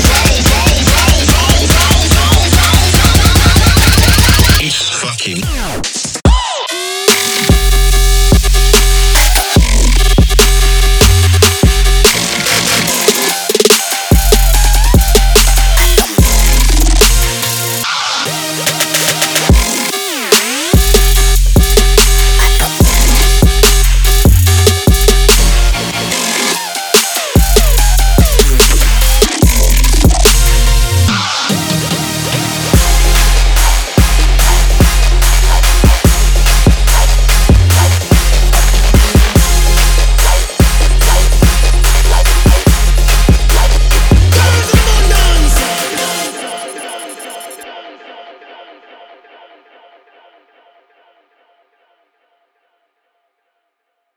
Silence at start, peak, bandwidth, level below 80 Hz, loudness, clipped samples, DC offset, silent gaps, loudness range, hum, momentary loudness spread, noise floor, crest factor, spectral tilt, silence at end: 0 s; 0 dBFS; over 20 kHz; -10 dBFS; -10 LUFS; under 0.1%; under 0.1%; none; 3 LU; none; 6 LU; -69 dBFS; 8 dB; -3.5 dB/octave; 5.85 s